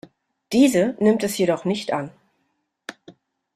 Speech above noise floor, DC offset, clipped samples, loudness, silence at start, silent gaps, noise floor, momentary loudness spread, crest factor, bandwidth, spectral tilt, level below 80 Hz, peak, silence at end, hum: 53 dB; under 0.1%; under 0.1%; -20 LUFS; 0.5 s; none; -72 dBFS; 22 LU; 18 dB; 14.5 kHz; -5 dB/octave; -62 dBFS; -4 dBFS; 0.45 s; none